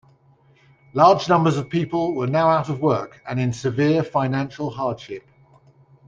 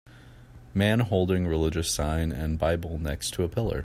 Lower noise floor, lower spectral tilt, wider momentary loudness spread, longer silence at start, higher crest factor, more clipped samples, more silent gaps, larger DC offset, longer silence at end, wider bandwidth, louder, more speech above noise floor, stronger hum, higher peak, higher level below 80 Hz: first, -56 dBFS vs -49 dBFS; first, -7 dB/octave vs -5.5 dB/octave; first, 12 LU vs 6 LU; first, 0.95 s vs 0.05 s; about the same, 18 dB vs 18 dB; neither; neither; neither; first, 0.9 s vs 0 s; second, 7.8 kHz vs 16 kHz; first, -21 LUFS vs -27 LUFS; first, 36 dB vs 23 dB; neither; first, -2 dBFS vs -10 dBFS; second, -58 dBFS vs -40 dBFS